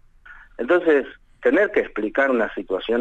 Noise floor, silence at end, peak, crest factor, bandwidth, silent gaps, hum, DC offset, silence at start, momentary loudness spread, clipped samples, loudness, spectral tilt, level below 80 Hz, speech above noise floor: -46 dBFS; 0 s; -8 dBFS; 14 dB; 8 kHz; none; none; under 0.1%; 0.3 s; 9 LU; under 0.1%; -21 LUFS; -6 dB/octave; -50 dBFS; 26 dB